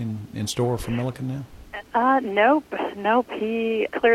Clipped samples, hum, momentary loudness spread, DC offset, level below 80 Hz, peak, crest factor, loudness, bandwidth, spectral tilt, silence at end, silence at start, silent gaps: under 0.1%; none; 12 LU; under 0.1%; -50 dBFS; -6 dBFS; 16 dB; -23 LUFS; 15.5 kHz; -5.5 dB/octave; 0 s; 0 s; none